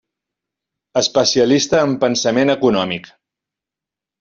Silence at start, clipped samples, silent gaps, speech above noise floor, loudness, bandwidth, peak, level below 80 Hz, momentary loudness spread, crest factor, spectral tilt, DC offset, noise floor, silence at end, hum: 0.95 s; under 0.1%; none; 72 dB; -16 LUFS; 7.6 kHz; -2 dBFS; -56 dBFS; 8 LU; 16 dB; -4 dB/octave; under 0.1%; -87 dBFS; 1.2 s; none